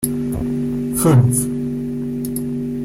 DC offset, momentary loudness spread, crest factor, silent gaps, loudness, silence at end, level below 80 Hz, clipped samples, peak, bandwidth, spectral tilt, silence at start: under 0.1%; 10 LU; 16 dB; none; -19 LUFS; 0 s; -40 dBFS; under 0.1%; -2 dBFS; 16.5 kHz; -6.5 dB/octave; 0 s